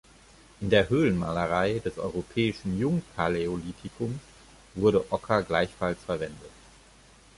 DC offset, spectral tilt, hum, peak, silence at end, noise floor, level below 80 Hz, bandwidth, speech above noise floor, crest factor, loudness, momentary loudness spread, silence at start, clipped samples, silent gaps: under 0.1%; -6.5 dB/octave; none; -8 dBFS; 0.9 s; -55 dBFS; -50 dBFS; 11.5 kHz; 28 dB; 20 dB; -28 LUFS; 12 LU; 0.6 s; under 0.1%; none